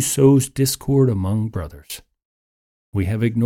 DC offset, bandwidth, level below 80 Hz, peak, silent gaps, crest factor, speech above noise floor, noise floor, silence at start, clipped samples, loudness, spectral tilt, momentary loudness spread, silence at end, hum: under 0.1%; 17 kHz; -44 dBFS; -2 dBFS; 2.25-2.93 s; 16 dB; over 72 dB; under -90 dBFS; 0 s; under 0.1%; -19 LUFS; -6 dB/octave; 19 LU; 0 s; none